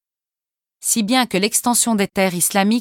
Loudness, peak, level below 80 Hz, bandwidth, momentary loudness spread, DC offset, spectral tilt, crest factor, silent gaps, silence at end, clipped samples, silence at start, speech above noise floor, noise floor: -17 LUFS; -4 dBFS; -58 dBFS; 18.5 kHz; 3 LU; under 0.1%; -3 dB/octave; 16 dB; none; 0 s; under 0.1%; 0.85 s; 72 dB; -89 dBFS